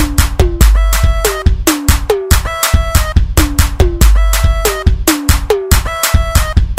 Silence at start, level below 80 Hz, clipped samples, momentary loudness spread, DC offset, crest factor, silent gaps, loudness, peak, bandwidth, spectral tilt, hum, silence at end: 0 s; -12 dBFS; 0.2%; 3 LU; under 0.1%; 10 dB; none; -12 LUFS; 0 dBFS; 16.5 kHz; -4.5 dB/octave; none; 0 s